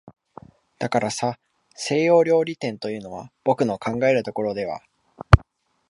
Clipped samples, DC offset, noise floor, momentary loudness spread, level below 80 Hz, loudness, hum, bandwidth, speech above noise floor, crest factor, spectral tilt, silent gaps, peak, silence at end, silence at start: under 0.1%; under 0.1%; -55 dBFS; 14 LU; -34 dBFS; -22 LUFS; none; 11.5 kHz; 33 dB; 22 dB; -6 dB/octave; none; 0 dBFS; 0.5 s; 0.05 s